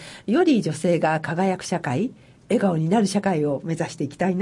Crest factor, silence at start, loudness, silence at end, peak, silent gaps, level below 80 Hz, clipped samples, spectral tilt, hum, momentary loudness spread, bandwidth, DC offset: 14 dB; 0 s; -23 LUFS; 0 s; -8 dBFS; none; -62 dBFS; under 0.1%; -6.5 dB/octave; none; 7 LU; 11.5 kHz; under 0.1%